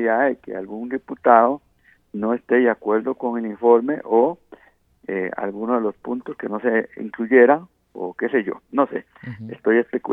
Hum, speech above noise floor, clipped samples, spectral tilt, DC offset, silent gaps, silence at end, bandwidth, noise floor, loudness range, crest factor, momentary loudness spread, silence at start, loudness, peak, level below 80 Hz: none; 35 dB; under 0.1%; -9.5 dB/octave; under 0.1%; none; 0 s; 3.7 kHz; -55 dBFS; 3 LU; 20 dB; 16 LU; 0 s; -20 LUFS; 0 dBFS; -66 dBFS